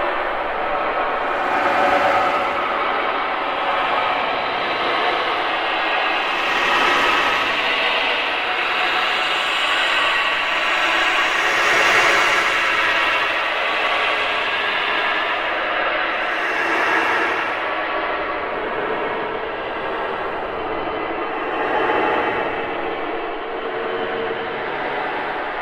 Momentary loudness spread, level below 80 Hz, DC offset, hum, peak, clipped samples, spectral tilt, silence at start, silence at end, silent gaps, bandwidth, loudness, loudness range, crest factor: 8 LU; -48 dBFS; under 0.1%; none; -4 dBFS; under 0.1%; -2 dB/octave; 0 s; 0 s; none; 16 kHz; -19 LUFS; 7 LU; 16 dB